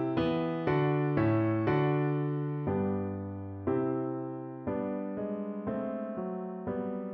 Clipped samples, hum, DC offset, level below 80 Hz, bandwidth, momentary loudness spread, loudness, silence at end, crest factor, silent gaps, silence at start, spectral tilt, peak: under 0.1%; none; under 0.1%; -60 dBFS; 5.4 kHz; 9 LU; -32 LUFS; 0 s; 16 dB; none; 0 s; -10.5 dB/octave; -16 dBFS